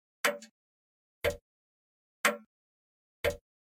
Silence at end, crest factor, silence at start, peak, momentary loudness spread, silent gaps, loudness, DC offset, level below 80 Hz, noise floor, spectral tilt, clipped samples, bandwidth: 0.25 s; 26 dB; 0.25 s; -12 dBFS; 15 LU; 0.51-1.21 s, 1.41-2.24 s, 2.46-3.24 s; -33 LUFS; under 0.1%; -56 dBFS; under -90 dBFS; -2.5 dB/octave; under 0.1%; 16.5 kHz